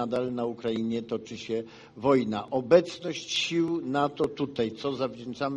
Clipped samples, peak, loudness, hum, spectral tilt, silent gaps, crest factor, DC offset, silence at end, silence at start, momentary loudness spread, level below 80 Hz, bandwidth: under 0.1%; -6 dBFS; -28 LUFS; none; -5 dB/octave; none; 22 dB; under 0.1%; 0 s; 0 s; 11 LU; -66 dBFS; 11 kHz